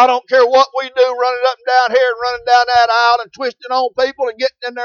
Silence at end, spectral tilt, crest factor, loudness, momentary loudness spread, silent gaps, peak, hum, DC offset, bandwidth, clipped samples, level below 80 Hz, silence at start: 0 s; -1.5 dB/octave; 14 dB; -14 LUFS; 8 LU; none; 0 dBFS; none; under 0.1%; 7 kHz; under 0.1%; -56 dBFS; 0 s